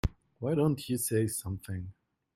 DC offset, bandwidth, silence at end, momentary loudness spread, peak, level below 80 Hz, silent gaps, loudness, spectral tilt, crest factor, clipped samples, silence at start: under 0.1%; 16.5 kHz; 0.45 s; 12 LU; -16 dBFS; -46 dBFS; none; -32 LUFS; -6 dB/octave; 18 dB; under 0.1%; 0.05 s